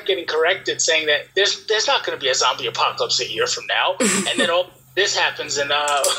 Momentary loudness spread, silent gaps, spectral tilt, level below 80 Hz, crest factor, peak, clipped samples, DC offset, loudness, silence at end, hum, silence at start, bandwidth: 3 LU; none; -1 dB/octave; -64 dBFS; 18 dB; -2 dBFS; under 0.1%; under 0.1%; -19 LUFS; 0 s; none; 0 s; 16 kHz